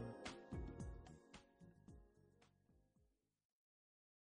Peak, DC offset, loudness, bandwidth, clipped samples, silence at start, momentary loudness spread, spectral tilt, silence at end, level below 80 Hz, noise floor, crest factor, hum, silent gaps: -38 dBFS; under 0.1%; -56 LUFS; 10 kHz; under 0.1%; 0 s; 15 LU; -6 dB/octave; 1.25 s; -64 dBFS; -82 dBFS; 20 dB; none; none